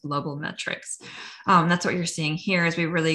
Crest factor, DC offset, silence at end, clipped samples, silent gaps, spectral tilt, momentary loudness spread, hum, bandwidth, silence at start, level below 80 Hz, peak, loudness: 18 dB; under 0.1%; 0 s; under 0.1%; none; -4.5 dB/octave; 14 LU; none; 12 kHz; 0.05 s; -62 dBFS; -6 dBFS; -24 LUFS